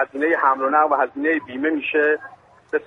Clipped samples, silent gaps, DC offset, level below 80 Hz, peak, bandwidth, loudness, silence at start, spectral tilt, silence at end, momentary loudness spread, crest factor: under 0.1%; none; under 0.1%; -68 dBFS; -4 dBFS; 3.9 kHz; -20 LUFS; 0 s; -6 dB/octave; 0 s; 6 LU; 16 dB